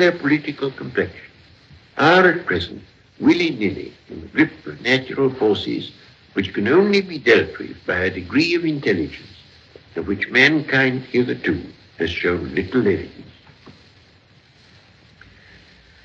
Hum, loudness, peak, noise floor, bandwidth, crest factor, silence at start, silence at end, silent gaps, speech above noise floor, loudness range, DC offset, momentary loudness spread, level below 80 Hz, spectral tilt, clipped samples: none; -19 LUFS; 0 dBFS; -52 dBFS; 7.8 kHz; 20 dB; 0 s; 2.35 s; none; 33 dB; 6 LU; under 0.1%; 16 LU; -52 dBFS; -6 dB/octave; under 0.1%